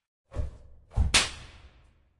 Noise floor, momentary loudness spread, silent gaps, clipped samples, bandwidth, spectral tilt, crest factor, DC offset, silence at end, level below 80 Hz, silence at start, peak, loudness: -60 dBFS; 19 LU; none; under 0.1%; 11.5 kHz; -2 dB/octave; 24 dB; under 0.1%; 0.55 s; -36 dBFS; 0.35 s; -8 dBFS; -27 LUFS